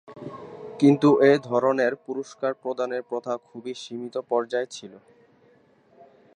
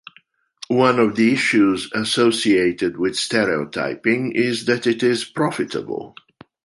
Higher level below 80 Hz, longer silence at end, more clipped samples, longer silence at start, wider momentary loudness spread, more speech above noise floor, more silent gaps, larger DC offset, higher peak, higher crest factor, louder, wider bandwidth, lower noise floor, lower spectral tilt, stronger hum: second, -76 dBFS vs -58 dBFS; first, 1.4 s vs 0.55 s; neither; second, 0.1 s vs 0.7 s; first, 22 LU vs 9 LU; about the same, 35 dB vs 37 dB; neither; neither; second, -6 dBFS vs -2 dBFS; about the same, 20 dB vs 18 dB; second, -24 LUFS vs -19 LUFS; second, 10 kHz vs 11.5 kHz; about the same, -59 dBFS vs -56 dBFS; first, -6.5 dB/octave vs -4.5 dB/octave; neither